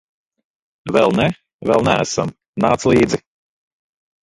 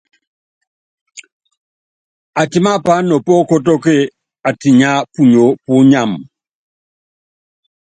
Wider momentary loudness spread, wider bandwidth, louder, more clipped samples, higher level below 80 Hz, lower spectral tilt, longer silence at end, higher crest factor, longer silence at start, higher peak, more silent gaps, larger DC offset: about the same, 11 LU vs 11 LU; first, 11.5 kHz vs 9.2 kHz; second, -17 LUFS vs -12 LUFS; neither; first, -46 dBFS vs -56 dBFS; about the same, -5.5 dB/octave vs -6.5 dB/octave; second, 1.05 s vs 1.7 s; about the same, 18 dB vs 14 dB; second, 0.85 s vs 1.15 s; about the same, 0 dBFS vs 0 dBFS; second, 1.53-1.59 s, 2.48-2.53 s vs 1.32-1.40 s, 1.57-2.33 s; neither